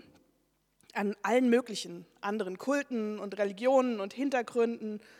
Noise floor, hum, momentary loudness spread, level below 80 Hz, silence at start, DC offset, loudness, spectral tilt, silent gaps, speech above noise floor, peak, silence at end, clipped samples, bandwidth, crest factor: -74 dBFS; none; 12 LU; -82 dBFS; 0.95 s; under 0.1%; -31 LUFS; -5 dB/octave; none; 43 dB; -14 dBFS; 0.2 s; under 0.1%; 14.5 kHz; 18 dB